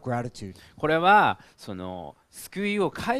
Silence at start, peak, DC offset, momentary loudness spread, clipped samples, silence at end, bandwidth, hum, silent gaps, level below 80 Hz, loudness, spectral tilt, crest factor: 0.05 s; -6 dBFS; under 0.1%; 23 LU; under 0.1%; 0 s; 14.5 kHz; none; none; -58 dBFS; -23 LUFS; -5.5 dB/octave; 20 dB